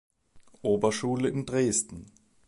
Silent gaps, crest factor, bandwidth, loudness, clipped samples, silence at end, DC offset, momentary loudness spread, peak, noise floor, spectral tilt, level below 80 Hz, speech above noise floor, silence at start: none; 18 dB; 11.5 kHz; -28 LUFS; under 0.1%; 0.45 s; under 0.1%; 10 LU; -12 dBFS; -56 dBFS; -4.5 dB/octave; -60 dBFS; 28 dB; 0.35 s